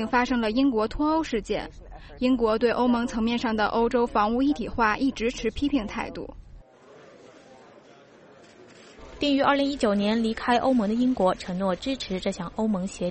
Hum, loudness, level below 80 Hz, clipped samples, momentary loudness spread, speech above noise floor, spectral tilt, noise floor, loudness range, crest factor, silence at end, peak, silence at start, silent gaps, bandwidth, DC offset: none; -25 LUFS; -46 dBFS; under 0.1%; 7 LU; 27 dB; -5.5 dB/octave; -52 dBFS; 9 LU; 16 dB; 0 s; -8 dBFS; 0 s; none; 8.8 kHz; under 0.1%